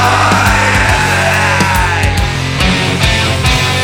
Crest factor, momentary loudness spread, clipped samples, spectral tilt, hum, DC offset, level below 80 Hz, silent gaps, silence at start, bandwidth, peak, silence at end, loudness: 10 dB; 4 LU; under 0.1%; -4 dB/octave; none; under 0.1%; -20 dBFS; none; 0 s; 18 kHz; 0 dBFS; 0 s; -10 LUFS